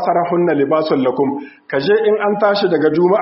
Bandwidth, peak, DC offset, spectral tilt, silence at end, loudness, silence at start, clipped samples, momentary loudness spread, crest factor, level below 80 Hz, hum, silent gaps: 5.8 kHz; -2 dBFS; under 0.1%; -4.5 dB/octave; 0 s; -15 LUFS; 0 s; under 0.1%; 6 LU; 14 dB; -62 dBFS; none; none